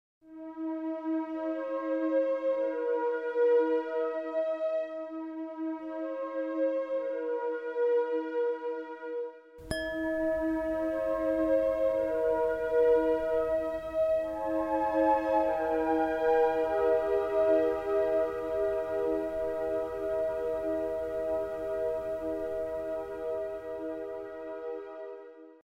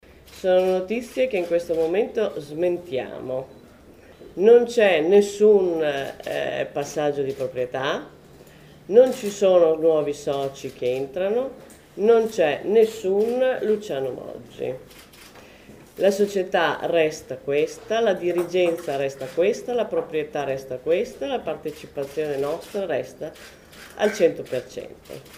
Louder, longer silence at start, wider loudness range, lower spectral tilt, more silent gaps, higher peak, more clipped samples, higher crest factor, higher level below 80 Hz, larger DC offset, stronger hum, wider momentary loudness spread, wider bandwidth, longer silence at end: second, -31 LUFS vs -22 LUFS; about the same, 0.25 s vs 0.3 s; about the same, 6 LU vs 7 LU; first, -6.5 dB/octave vs -5 dB/octave; neither; second, -16 dBFS vs -4 dBFS; neither; about the same, 16 dB vs 20 dB; about the same, -56 dBFS vs -58 dBFS; neither; neither; about the same, 12 LU vs 14 LU; second, 12.5 kHz vs 16 kHz; about the same, 0.1 s vs 0 s